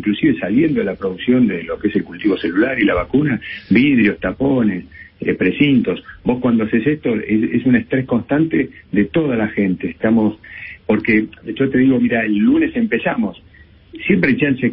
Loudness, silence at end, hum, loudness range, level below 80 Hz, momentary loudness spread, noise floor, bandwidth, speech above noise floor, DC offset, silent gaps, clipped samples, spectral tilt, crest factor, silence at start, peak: -17 LUFS; 0 s; none; 1 LU; -44 dBFS; 8 LU; -43 dBFS; 5.2 kHz; 27 dB; under 0.1%; none; under 0.1%; -12 dB/octave; 16 dB; 0 s; 0 dBFS